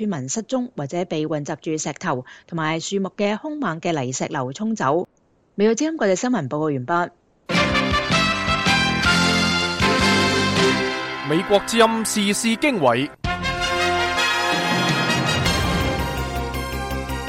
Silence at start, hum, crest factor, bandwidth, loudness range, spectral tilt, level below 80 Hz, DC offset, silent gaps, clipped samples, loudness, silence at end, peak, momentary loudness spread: 0 s; none; 18 dB; 16 kHz; 7 LU; -4 dB/octave; -38 dBFS; under 0.1%; none; under 0.1%; -20 LUFS; 0 s; -4 dBFS; 9 LU